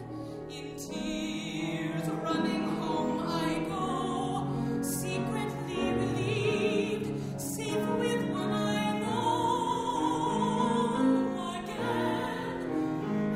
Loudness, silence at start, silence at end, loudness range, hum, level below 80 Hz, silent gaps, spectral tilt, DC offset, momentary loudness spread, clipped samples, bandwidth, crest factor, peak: -31 LUFS; 0 s; 0 s; 3 LU; none; -56 dBFS; none; -5.5 dB/octave; under 0.1%; 7 LU; under 0.1%; 16 kHz; 16 dB; -16 dBFS